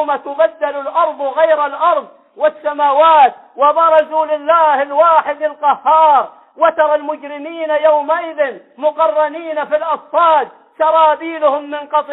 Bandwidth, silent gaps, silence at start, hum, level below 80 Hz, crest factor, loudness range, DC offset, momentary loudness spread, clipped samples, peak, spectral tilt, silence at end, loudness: 4.1 kHz; none; 0 s; none; -64 dBFS; 12 dB; 4 LU; under 0.1%; 9 LU; under 0.1%; -2 dBFS; -6 dB/octave; 0 s; -14 LUFS